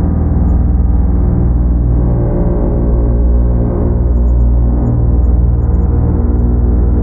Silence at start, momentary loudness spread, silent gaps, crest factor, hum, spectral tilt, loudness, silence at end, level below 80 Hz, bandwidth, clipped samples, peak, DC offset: 0 s; 2 LU; none; 10 dB; 60 Hz at -15 dBFS; -14 dB/octave; -13 LUFS; 0 s; -12 dBFS; 2 kHz; under 0.1%; 0 dBFS; under 0.1%